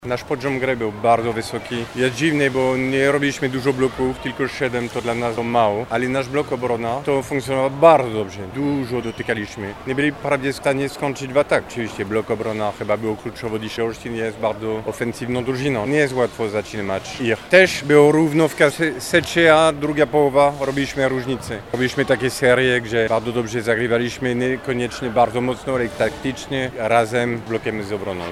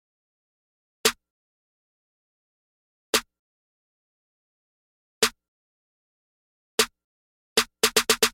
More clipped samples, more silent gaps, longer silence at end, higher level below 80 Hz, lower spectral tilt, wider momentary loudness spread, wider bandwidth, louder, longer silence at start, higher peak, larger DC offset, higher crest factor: neither; second, none vs 1.30-3.13 s, 3.39-5.21 s, 5.48-6.78 s, 7.04-7.56 s; about the same, 0 s vs 0.05 s; first, -48 dBFS vs -62 dBFS; first, -5.5 dB/octave vs 0 dB/octave; first, 11 LU vs 5 LU; about the same, 15.5 kHz vs 16.5 kHz; first, -20 LUFS vs -24 LUFS; second, 0 s vs 1.05 s; first, 0 dBFS vs -6 dBFS; neither; second, 20 dB vs 26 dB